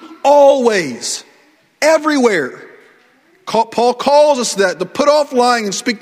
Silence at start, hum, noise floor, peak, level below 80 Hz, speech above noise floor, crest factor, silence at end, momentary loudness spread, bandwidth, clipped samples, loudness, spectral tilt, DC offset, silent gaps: 0 s; none; -52 dBFS; 0 dBFS; -62 dBFS; 39 dB; 14 dB; 0.05 s; 11 LU; 15 kHz; under 0.1%; -13 LUFS; -3 dB/octave; under 0.1%; none